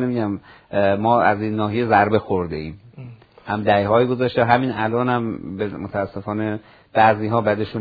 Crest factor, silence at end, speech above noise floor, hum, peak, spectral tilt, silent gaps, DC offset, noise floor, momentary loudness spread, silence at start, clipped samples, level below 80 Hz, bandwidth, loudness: 20 dB; 0 s; 20 dB; none; 0 dBFS; -9.5 dB/octave; none; under 0.1%; -39 dBFS; 12 LU; 0 s; under 0.1%; -52 dBFS; 5 kHz; -20 LUFS